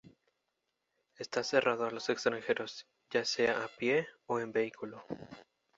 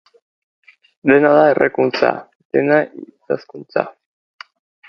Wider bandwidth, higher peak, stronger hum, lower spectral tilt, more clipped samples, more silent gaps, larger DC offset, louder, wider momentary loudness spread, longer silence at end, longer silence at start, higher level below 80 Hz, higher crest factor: first, 7.8 kHz vs 6.4 kHz; second, -12 dBFS vs 0 dBFS; neither; second, -3.5 dB/octave vs -7.5 dB/octave; neither; second, none vs 2.35-2.50 s; neither; second, -34 LUFS vs -16 LUFS; about the same, 16 LU vs 16 LU; second, 0.35 s vs 1 s; second, 0.05 s vs 1.05 s; second, -76 dBFS vs -64 dBFS; first, 24 dB vs 18 dB